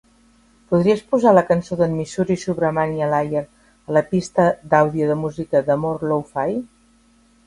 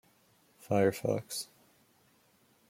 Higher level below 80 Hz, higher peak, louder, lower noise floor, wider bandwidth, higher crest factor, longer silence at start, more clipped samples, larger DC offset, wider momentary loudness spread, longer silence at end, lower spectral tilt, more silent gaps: first, -52 dBFS vs -74 dBFS; first, 0 dBFS vs -16 dBFS; first, -19 LUFS vs -32 LUFS; second, -55 dBFS vs -68 dBFS; second, 11.5 kHz vs 16.5 kHz; about the same, 20 dB vs 20 dB; about the same, 0.7 s vs 0.65 s; neither; neither; second, 8 LU vs 11 LU; second, 0.8 s vs 1.25 s; first, -7 dB/octave vs -5.5 dB/octave; neither